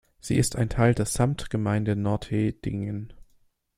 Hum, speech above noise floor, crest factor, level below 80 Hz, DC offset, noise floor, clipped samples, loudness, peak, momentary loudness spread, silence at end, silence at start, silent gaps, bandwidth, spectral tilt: none; 39 dB; 20 dB; -44 dBFS; under 0.1%; -63 dBFS; under 0.1%; -26 LUFS; -6 dBFS; 9 LU; 0.55 s; 0.25 s; none; 15 kHz; -6 dB/octave